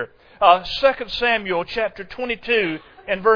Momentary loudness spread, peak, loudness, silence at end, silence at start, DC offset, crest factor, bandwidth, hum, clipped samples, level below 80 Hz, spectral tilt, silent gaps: 11 LU; 0 dBFS; -20 LUFS; 0 s; 0 s; under 0.1%; 20 dB; 5.4 kHz; none; under 0.1%; -48 dBFS; -5 dB/octave; none